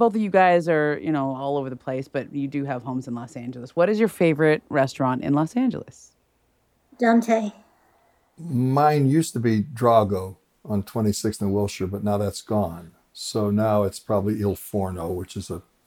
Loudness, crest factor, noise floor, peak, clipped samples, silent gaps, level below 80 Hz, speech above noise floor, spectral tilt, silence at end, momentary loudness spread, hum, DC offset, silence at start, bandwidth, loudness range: -23 LUFS; 18 dB; -66 dBFS; -4 dBFS; under 0.1%; none; -56 dBFS; 44 dB; -6.5 dB/octave; 0.25 s; 12 LU; none; under 0.1%; 0 s; 18 kHz; 4 LU